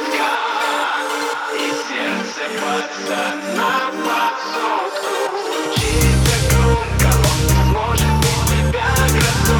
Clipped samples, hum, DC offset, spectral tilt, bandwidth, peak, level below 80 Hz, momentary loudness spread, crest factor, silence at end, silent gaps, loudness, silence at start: under 0.1%; none; under 0.1%; -4.5 dB/octave; over 20 kHz; 0 dBFS; -24 dBFS; 7 LU; 16 dB; 0 s; none; -17 LUFS; 0 s